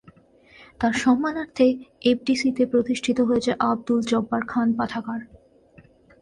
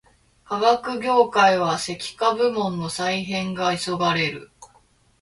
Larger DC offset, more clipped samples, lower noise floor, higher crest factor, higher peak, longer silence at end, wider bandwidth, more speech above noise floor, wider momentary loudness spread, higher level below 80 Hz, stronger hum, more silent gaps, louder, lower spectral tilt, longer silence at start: neither; neither; second, -53 dBFS vs -59 dBFS; about the same, 16 dB vs 18 dB; second, -8 dBFS vs -4 dBFS; first, 0.95 s vs 0.55 s; about the same, 11 kHz vs 11.5 kHz; second, 31 dB vs 37 dB; second, 6 LU vs 9 LU; about the same, -56 dBFS vs -60 dBFS; neither; neither; about the same, -23 LUFS vs -22 LUFS; about the same, -5 dB/octave vs -4 dB/octave; first, 0.8 s vs 0.5 s